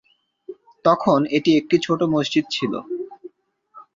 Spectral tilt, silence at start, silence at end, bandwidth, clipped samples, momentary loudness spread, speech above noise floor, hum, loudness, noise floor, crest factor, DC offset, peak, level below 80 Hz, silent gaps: -6 dB/octave; 0.5 s; 0.15 s; 7.6 kHz; under 0.1%; 19 LU; 37 dB; none; -20 LUFS; -56 dBFS; 18 dB; under 0.1%; -2 dBFS; -62 dBFS; none